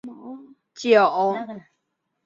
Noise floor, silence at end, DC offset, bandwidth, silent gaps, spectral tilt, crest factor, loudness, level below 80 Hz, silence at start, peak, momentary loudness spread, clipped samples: -77 dBFS; 0.65 s; under 0.1%; 7.6 kHz; none; -4.5 dB/octave; 20 dB; -20 LUFS; -74 dBFS; 0.05 s; -4 dBFS; 24 LU; under 0.1%